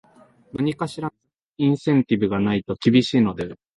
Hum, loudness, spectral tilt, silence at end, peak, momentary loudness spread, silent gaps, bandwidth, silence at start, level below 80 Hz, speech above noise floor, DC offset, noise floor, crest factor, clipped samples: none; -21 LUFS; -7 dB/octave; 0.25 s; -4 dBFS; 14 LU; 1.46-1.50 s; 11.5 kHz; 0.55 s; -54 dBFS; 30 dB; under 0.1%; -51 dBFS; 18 dB; under 0.1%